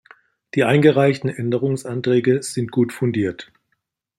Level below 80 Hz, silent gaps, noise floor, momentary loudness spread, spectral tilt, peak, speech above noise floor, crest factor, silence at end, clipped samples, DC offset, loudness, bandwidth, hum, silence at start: -62 dBFS; none; -73 dBFS; 9 LU; -6.5 dB/octave; -2 dBFS; 55 dB; 18 dB; 0.75 s; under 0.1%; under 0.1%; -19 LUFS; 13 kHz; none; 0.55 s